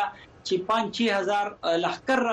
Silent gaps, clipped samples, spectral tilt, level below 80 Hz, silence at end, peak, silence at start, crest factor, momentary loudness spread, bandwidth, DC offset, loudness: none; under 0.1%; -4 dB/octave; -64 dBFS; 0 s; -12 dBFS; 0 s; 14 dB; 6 LU; 11 kHz; under 0.1%; -26 LUFS